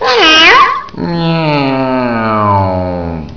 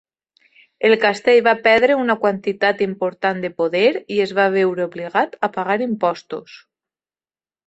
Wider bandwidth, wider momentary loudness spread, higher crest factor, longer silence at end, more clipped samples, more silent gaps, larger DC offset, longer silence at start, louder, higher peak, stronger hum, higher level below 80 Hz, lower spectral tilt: second, 5.4 kHz vs 8.2 kHz; first, 14 LU vs 8 LU; second, 10 dB vs 18 dB; second, 0 s vs 1.1 s; first, 0.9% vs under 0.1%; neither; first, 1% vs under 0.1%; second, 0 s vs 0.8 s; first, -9 LUFS vs -18 LUFS; about the same, 0 dBFS vs -2 dBFS; neither; first, -36 dBFS vs -64 dBFS; about the same, -4.5 dB/octave vs -5.5 dB/octave